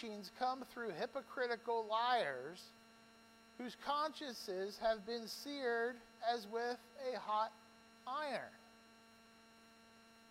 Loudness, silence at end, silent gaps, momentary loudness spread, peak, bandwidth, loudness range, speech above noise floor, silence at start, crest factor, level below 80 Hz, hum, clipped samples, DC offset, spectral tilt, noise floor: -42 LUFS; 0 s; none; 17 LU; -26 dBFS; 16 kHz; 4 LU; 23 dB; 0 s; 18 dB; -80 dBFS; none; under 0.1%; under 0.1%; -3 dB/octave; -65 dBFS